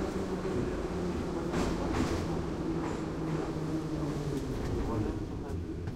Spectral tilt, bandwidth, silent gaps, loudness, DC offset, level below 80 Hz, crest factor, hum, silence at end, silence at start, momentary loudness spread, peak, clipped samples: -7 dB/octave; 15.5 kHz; none; -34 LUFS; under 0.1%; -42 dBFS; 16 dB; none; 0 s; 0 s; 3 LU; -18 dBFS; under 0.1%